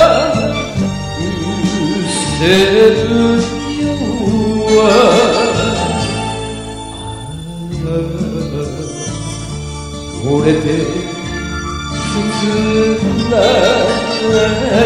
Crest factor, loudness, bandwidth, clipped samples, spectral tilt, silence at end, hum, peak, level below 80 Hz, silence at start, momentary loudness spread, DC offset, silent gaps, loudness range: 14 dB; -14 LUFS; 15 kHz; under 0.1%; -5 dB/octave; 0 s; none; 0 dBFS; -32 dBFS; 0 s; 14 LU; 0.2%; none; 10 LU